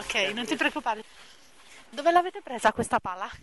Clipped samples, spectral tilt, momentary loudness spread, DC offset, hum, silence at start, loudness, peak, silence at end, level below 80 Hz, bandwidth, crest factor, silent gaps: under 0.1%; -3 dB/octave; 11 LU; 0.2%; none; 0 s; -27 LUFS; -8 dBFS; 0.05 s; -58 dBFS; 11.5 kHz; 20 dB; none